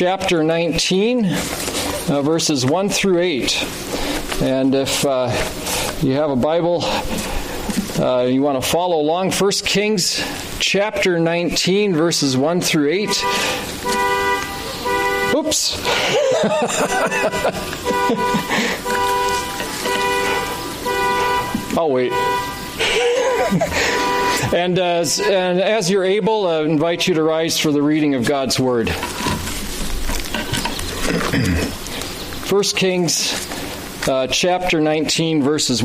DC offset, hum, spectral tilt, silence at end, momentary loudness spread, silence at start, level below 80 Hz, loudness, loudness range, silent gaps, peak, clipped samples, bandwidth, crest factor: under 0.1%; none; -3.5 dB/octave; 0 s; 7 LU; 0 s; -36 dBFS; -18 LUFS; 3 LU; none; -4 dBFS; under 0.1%; 15.5 kHz; 14 dB